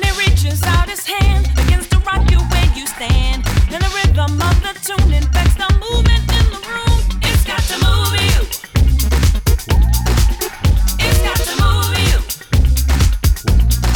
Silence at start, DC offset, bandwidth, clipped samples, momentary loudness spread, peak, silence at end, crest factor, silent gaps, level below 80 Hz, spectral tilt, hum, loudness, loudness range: 0 s; under 0.1%; 19.5 kHz; under 0.1%; 3 LU; -2 dBFS; 0 s; 10 dB; none; -14 dBFS; -4.5 dB/octave; none; -15 LUFS; 1 LU